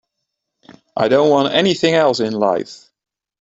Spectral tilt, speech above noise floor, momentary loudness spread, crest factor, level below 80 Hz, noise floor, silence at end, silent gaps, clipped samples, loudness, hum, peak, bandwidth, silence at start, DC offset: -5 dB/octave; 62 dB; 10 LU; 16 dB; -60 dBFS; -77 dBFS; 0.75 s; none; under 0.1%; -15 LUFS; none; -2 dBFS; 8 kHz; 0.95 s; under 0.1%